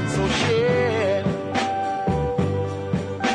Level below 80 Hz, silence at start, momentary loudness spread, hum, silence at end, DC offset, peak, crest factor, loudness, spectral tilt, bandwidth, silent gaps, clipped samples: -42 dBFS; 0 s; 6 LU; none; 0 s; under 0.1%; -10 dBFS; 12 dB; -22 LUFS; -5.5 dB/octave; 10.5 kHz; none; under 0.1%